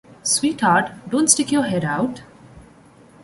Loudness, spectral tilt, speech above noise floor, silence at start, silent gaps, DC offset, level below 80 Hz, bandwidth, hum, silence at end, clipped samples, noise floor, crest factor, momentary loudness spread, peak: -19 LUFS; -3 dB/octave; 29 dB; 0.25 s; none; under 0.1%; -56 dBFS; 12 kHz; none; 0.65 s; under 0.1%; -48 dBFS; 22 dB; 8 LU; 0 dBFS